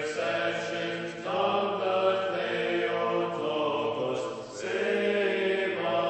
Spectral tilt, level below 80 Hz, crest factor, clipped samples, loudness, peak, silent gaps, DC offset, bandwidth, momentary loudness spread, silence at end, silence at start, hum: -4.5 dB/octave; -70 dBFS; 14 dB; under 0.1%; -29 LUFS; -14 dBFS; none; under 0.1%; 8.4 kHz; 6 LU; 0 s; 0 s; none